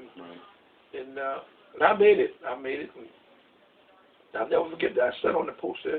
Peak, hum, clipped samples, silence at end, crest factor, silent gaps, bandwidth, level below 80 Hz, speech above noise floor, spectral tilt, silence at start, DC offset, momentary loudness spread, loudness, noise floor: -6 dBFS; none; under 0.1%; 0 s; 24 dB; none; 4.4 kHz; -68 dBFS; 34 dB; -8 dB/octave; 0 s; under 0.1%; 22 LU; -26 LUFS; -60 dBFS